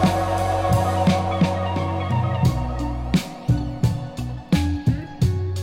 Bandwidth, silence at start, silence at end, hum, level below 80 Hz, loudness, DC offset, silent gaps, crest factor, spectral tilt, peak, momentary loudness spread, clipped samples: 16.5 kHz; 0 s; 0 s; none; -34 dBFS; -22 LUFS; under 0.1%; none; 14 dB; -7 dB/octave; -6 dBFS; 6 LU; under 0.1%